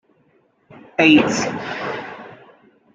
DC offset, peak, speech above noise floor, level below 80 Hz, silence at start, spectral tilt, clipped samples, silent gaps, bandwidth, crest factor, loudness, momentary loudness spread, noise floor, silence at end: under 0.1%; -2 dBFS; 42 dB; -60 dBFS; 0.75 s; -4 dB/octave; under 0.1%; none; 7.8 kHz; 20 dB; -17 LUFS; 20 LU; -60 dBFS; 0.6 s